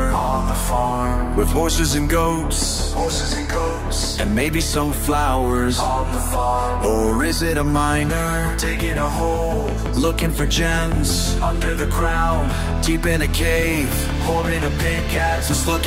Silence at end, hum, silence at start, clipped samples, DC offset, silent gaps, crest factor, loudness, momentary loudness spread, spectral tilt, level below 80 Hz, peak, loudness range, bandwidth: 0 s; none; 0 s; under 0.1%; under 0.1%; none; 14 dB; -20 LUFS; 3 LU; -4.5 dB/octave; -24 dBFS; -4 dBFS; 1 LU; 16 kHz